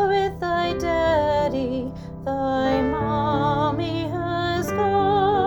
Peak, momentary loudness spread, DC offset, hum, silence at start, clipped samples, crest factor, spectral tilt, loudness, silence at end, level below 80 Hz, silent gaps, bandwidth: -8 dBFS; 6 LU; under 0.1%; none; 0 s; under 0.1%; 14 dB; -6.5 dB/octave; -22 LUFS; 0 s; -42 dBFS; none; over 20 kHz